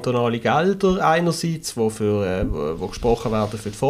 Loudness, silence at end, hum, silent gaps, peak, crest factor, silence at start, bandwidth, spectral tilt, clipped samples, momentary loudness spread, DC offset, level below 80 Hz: -21 LUFS; 0 s; none; none; -6 dBFS; 16 dB; 0 s; 15.5 kHz; -5.5 dB/octave; under 0.1%; 7 LU; under 0.1%; -38 dBFS